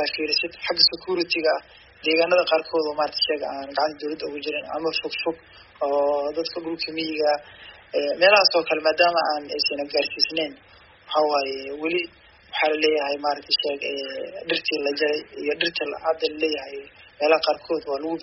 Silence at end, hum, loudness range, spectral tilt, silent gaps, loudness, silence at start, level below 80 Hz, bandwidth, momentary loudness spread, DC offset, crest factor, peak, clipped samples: 0 s; none; 5 LU; 0.5 dB/octave; none; -23 LUFS; 0 s; -64 dBFS; 6 kHz; 10 LU; under 0.1%; 22 dB; -2 dBFS; under 0.1%